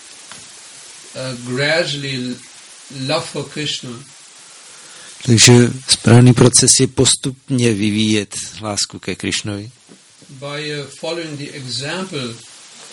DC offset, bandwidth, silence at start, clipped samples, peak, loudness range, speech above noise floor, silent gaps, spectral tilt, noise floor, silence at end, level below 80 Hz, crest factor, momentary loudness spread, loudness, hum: under 0.1%; 11.5 kHz; 0.05 s; under 0.1%; 0 dBFS; 13 LU; 29 dB; none; -4 dB/octave; -45 dBFS; 0 s; -48 dBFS; 18 dB; 26 LU; -15 LUFS; none